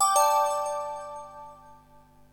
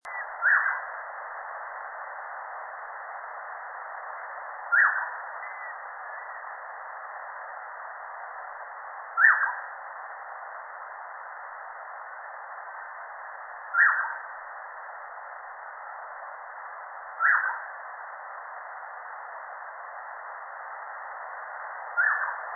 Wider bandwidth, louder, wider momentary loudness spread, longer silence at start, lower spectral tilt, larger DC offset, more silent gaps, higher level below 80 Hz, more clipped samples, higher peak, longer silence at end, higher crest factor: first, 19 kHz vs 2.4 kHz; first, -26 LUFS vs -31 LUFS; first, 24 LU vs 18 LU; about the same, 0 s vs 0.05 s; second, 0.5 dB/octave vs -1 dB/octave; neither; neither; first, -64 dBFS vs -84 dBFS; neither; second, -10 dBFS vs -6 dBFS; first, 0.6 s vs 0 s; second, 18 dB vs 26 dB